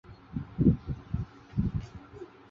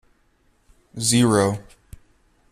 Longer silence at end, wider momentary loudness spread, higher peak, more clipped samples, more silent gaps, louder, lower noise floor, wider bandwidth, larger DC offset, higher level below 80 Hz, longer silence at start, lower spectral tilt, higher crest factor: second, 0.25 s vs 0.9 s; first, 20 LU vs 17 LU; second, -10 dBFS vs -6 dBFS; neither; neither; second, -32 LUFS vs -19 LUFS; second, -48 dBFS vs -62 dBFS; second, 7 kHz vs 15 kHz; neither; first, -42 dBFS vs -52 dBFS; second, 0.1 s vs 0.95 s; first, -10.5 dB/octave vs -4.5 dB/octave; about the same, 22 dB vs 18 dB